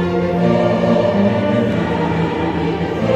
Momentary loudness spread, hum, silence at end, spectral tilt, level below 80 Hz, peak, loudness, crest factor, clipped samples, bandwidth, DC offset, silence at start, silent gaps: 4 LU; none; 0 s; -8 dB/octave; -40 dBFS; -2 dBFS; -16 LUFS; 14 dB; under 0.1%; 8.2 kHz; under 0.1%; 0 s; none